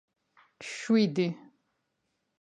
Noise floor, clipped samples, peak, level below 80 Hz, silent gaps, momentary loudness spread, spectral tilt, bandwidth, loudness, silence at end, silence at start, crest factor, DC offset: -80 dBFS; under 0.1%; -14 dBFS; -82 dBFS; none; 19 LU; -6 dB/octave; 9.6 kHz; -28 LUFS; 1 s; 0.6 s; 18 dB; under 0.1%